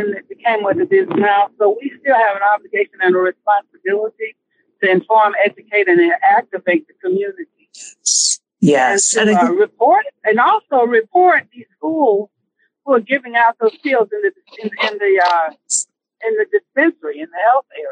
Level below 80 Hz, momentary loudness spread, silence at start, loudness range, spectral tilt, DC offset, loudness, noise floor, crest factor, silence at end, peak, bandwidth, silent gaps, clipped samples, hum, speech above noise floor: -70 dBFS; 11 LU; 0 s; 4 LU; -3 dB/octave; under 0.1%; -15 LUFS; -65 dBFS; 12 dB; 0 s; -2 dBFS; 10.5 kHz; none; under 0.1%; none; 50 dB